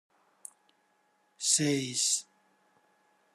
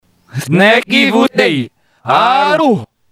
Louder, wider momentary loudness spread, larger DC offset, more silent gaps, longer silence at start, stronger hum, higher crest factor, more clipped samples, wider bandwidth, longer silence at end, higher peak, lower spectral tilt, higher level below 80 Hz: second, -28 LUFS vs -11 LUFS; first, 24 LU vs 16 LU; neither; neither; first, 1.4 s vs 0.35 s; neither; first, 24 dB vs 12 dB; second, under 0.1% vs 0.3%; second, 13 kHz vs 16 kHz; first, 1.15 s vs 0.25 s; second, -12 dBFS vs 0 dBFS; second, -2 dB/octave vs -5 dB/octave; second, -80 dBFS vs -60 dBFS